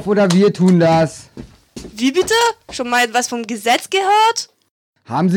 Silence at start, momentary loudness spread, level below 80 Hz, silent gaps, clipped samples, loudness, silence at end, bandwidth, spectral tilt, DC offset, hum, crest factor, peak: 0 s; 13 LU; -50 dBFS; 4.71-4.93 s; under 0.1%; -15 LUFS; 0 s; 18.5 kHz; -5 dB/octave; under 0.1%; none; 14 dB; -2 dBFS